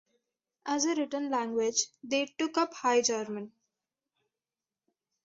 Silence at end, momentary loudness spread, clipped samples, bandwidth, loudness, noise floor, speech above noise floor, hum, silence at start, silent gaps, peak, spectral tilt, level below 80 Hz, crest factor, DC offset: 1.75 s; 12 LU; under 0.1%; 8.2 kHz; -30 LUFS; under -90 dBFS; over 60 dB; none; 0.65 s; none; -14 dBFS; -2 dB/octave; -80 dBFS; 18 dB; under 0.1%